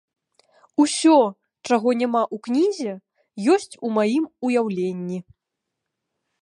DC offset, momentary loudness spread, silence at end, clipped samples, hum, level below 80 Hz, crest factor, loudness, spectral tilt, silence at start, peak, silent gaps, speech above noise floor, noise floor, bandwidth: under 0.1%; 14 LU; 1.2 s; under 0.1%; none; -72 dBFS; 18 dB; -21 LUFS; -5 dB/octave; 0.8 s; -4 dBFS; none; 62 dB; -82 dBFS; 11 kHz